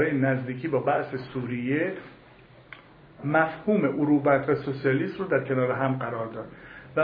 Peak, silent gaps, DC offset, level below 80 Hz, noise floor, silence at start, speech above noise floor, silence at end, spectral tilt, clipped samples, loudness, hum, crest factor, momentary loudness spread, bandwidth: -8 dBFS; none; under 0.1%; -62 dBFS; -52 dBFS; 0 s; 26 dB; 0 s; -11 dB/octave; under 0.1%; -26 LUFS; none; 18 dB; 17 LU; 5.2 kHz